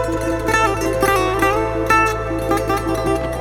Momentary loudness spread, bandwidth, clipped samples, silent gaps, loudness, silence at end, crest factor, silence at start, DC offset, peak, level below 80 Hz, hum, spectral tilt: 5 LU; 19.5 kHz; under 0.1%; none; -18 LUFS; 0 s; 16 dB; 0 s; under 0.1%; -2 dBFS; -30 dBFS; none; -5 dB/octave